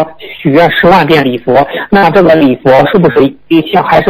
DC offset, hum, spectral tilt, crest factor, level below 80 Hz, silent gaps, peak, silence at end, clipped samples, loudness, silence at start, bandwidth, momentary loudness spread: under 0.1%; none; -7.5 dB/octave; 8 dB; -36 dBFS; none; 0 dBFS; 0 s; 0.3%; -7 LUFS; 0 s; 15.5 kHz; 5 LU